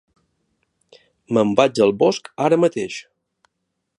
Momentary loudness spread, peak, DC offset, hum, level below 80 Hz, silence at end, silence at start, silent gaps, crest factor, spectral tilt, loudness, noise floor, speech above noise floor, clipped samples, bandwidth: 12 LU; 0 dBFS; under 0.1%; none; -64 dBFS; 0.95 s; 1.3 s; none; 20 dB; -5.5 dB/octave; -18 LUFS; -76 dBFS; 59 dB; under 0.1%; 11 kHz